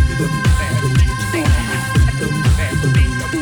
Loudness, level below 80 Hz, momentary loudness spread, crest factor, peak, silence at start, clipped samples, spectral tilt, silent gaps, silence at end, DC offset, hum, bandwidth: -16 LUFS; -20 dBFS; 2 LU; 12 dB; -2 dBFS; 0 s; under 0.1%; -5.5 dB/octave; none; 0 s; under 0.1%; none; over 20 kHz